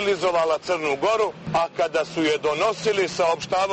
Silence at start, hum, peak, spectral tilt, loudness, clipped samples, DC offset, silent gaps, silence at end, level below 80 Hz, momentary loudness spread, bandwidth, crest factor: 0 s; none; -10 dBFS; -4 dB/octave; -23 LUFS; under 0.1%; under 0.1%; none; 0 s; -56 dBFS; 3 LU; 8.8 kHz; 12 dB